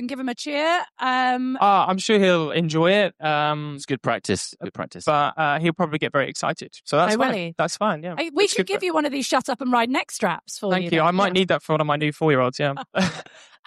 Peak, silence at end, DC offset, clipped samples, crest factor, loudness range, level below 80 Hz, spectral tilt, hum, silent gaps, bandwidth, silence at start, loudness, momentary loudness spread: -8 dBFS; 0.45 s; under 0.1%; under 0.1%; 14 dB; 3 LU; -66 dBFS; -4.5 dB/octave; none; none; 13 kHz; 0 s; -22 LUFS; 8 LU